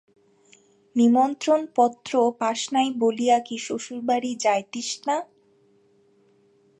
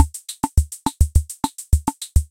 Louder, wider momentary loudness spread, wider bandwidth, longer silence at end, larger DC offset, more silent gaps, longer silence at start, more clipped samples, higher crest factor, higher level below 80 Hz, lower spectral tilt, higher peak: about the same, -23 LUFS vs -22 LUFS; first, 10 LU vs 7 LU; second, 10.5 kHz vs 17 kHz; first, 1.55 s vs 0.05 s; neither; neither; first, 0.95 s vs 0 s; neither; about the same, 18 dB vs 20 dB; second, -78 dBFS vs -22 dBFS; second, -3.5 dB/octave vs -5 dB/octave; second, -6 dBFS vs 0 dBFS